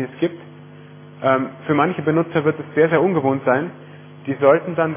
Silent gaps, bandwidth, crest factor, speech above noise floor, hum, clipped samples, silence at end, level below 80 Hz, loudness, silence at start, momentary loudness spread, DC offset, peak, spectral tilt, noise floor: none; 3.6 kHz; 18 dB; 22 dB; none; under 0.1%; 0 s; -62 dBFS; -19 LUFS; 0 s; 10 LU; under 0.1%; -2 dBFS; -11 dB/octave; -41 dBFS